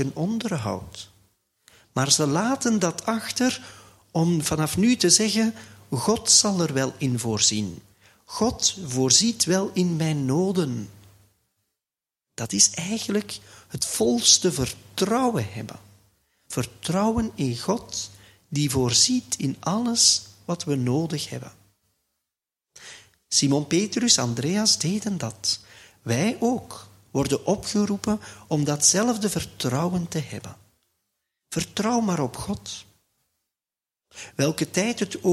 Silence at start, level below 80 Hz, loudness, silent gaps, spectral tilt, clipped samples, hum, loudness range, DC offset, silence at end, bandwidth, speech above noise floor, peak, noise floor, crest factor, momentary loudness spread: 0 s; -54 dBFS; -23 LUFS; none; -3.5 dB/octave; under 0.1%; none; 7 LU; under 0.1%; 0 s; 15.5 kHz; over 66 dB; -2 dBFS; under -90 dBFS; 22 dB; 16 LU